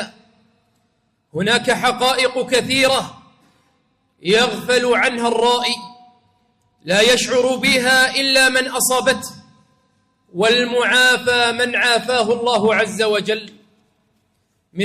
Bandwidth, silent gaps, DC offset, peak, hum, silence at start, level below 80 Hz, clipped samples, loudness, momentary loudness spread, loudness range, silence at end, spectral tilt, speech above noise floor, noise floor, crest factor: 15.5 kHz; none; under 0.1%; -4 dBFS; none; 0 s; -56 dBFS; under 0.1%; -16 LUFS; 11 LU; 4 LU; 0 s; -2 dB/octave; 49 dB; -65 dBFS; 14 dB